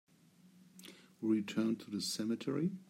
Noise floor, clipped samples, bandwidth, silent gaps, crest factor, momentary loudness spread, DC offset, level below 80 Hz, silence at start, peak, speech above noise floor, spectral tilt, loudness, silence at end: -65 dBFS; under 0.1%; 16 kHz; none; 16 dB; 20 LU; under 0.1%; -84 dBFS; 0.45 s; -22 dBFS; 29 dB; -5 dB/octave; -37 LUFS; 0.05 s